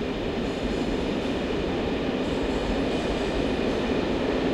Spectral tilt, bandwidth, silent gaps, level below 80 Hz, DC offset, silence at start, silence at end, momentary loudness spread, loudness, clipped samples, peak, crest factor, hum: -6 dB/octave; 12 kHz; none; -38 dBFS; under 0.1%; 0 s; 0 s; 2 LU; -27 LUFS; under 0.1%; -12 dBFS; 14 dB; none